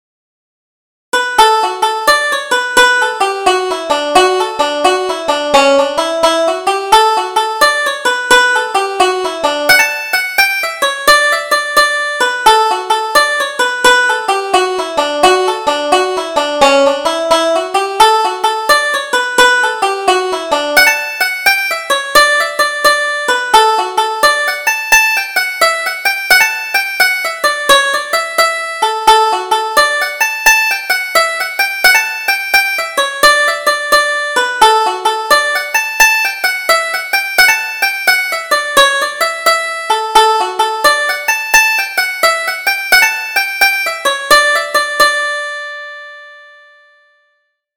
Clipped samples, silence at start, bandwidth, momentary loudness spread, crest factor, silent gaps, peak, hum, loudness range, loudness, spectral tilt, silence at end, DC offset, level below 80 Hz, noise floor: 0.1%; 1.15 s; over 20 kHz; 6 LU; 12 dB; none; 0 dBFS; none; 2 LU; -11 LUFS; 0 dB/octave; 1.35 s; under 0.1%; -46 dBFS; -63 dBFS